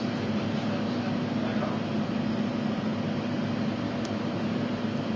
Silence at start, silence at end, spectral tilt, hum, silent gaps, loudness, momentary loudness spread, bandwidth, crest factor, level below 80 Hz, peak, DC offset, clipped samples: 0 s; 0 s; -7 dB/octave; none; none; -30 LUFS; 1 LU; 7.6 kHz; 12 dB; -58 dBFS; -18 dBFS; under 0.1%; under 0.1%